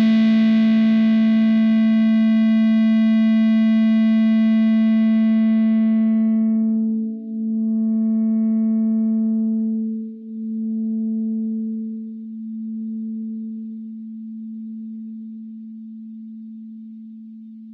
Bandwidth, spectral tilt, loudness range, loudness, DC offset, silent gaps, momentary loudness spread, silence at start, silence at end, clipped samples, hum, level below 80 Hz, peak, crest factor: 4.9 kHz; -9 dB/octave; 17 LU; -18 LUFS; under 0.1%; none; 20 LU; 0 s; 0 s; under 0.1%; none; -78 dBFS; -10 dBFS; 10 dB